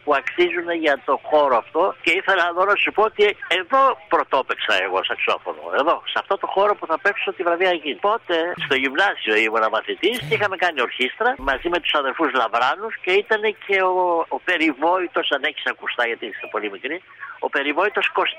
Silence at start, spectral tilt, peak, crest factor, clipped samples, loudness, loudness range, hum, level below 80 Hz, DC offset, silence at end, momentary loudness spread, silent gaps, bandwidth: 0.05 s; -4 dB/octave; -6 dBFS; 14 dB; under 0.1%; -20 LUFS; 3 LU; none; -54 dBFS; under 0.1%; 0 s; 6 LU; none; 15.5 kHz